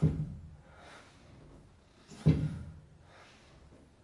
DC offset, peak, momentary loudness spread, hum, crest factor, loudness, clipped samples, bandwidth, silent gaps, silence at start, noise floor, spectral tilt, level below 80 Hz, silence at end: under 0.1%; -12 dBFS; 28 LU; none; 24 dB; -33 LUFS; under 0.1%; 10.5 kHz; none; 0 s; -60 dBFS; -8.5 dB/octave; -52 dBFS; 1.25 s